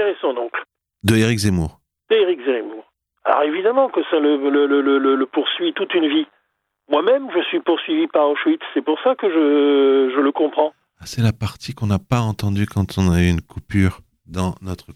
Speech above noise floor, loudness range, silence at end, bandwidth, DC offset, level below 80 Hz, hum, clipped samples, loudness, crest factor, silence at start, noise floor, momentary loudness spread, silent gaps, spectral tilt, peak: 53 dB; 3 LU; 0.05 s; 14.5 kHz; under 0.1%; -46 dBFS; none; under 0.1%; -19 LUFS; 18 dB; 0 s; -71 dBFS; 9 LU; none; -6.5 dB/octave; 0 dBFS